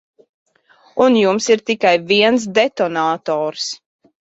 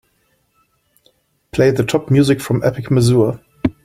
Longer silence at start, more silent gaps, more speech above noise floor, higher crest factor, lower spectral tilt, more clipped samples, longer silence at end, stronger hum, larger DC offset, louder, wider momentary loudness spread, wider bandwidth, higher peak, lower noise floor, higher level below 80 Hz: second, 0.95 s vs 1.55 s; neither; second, 37 dB vs 48 dB; about the same, 16 dB vs 16 dB; second, -3.5 dB/octave vs -7 dB/octave; neither; first, 0.6 s vs 0.15 s; neither; neither; about the same, -16 LUFS vs -16 LUFS; first, 11 LU vs 8 LU; second, 8.2 kHz vs 15.5 kHz; about the same, 0 dBFS vs -2 dBFS; second, -53 dBFS vs -62 dBFS; second, -62 dBFS vs -46 dBFS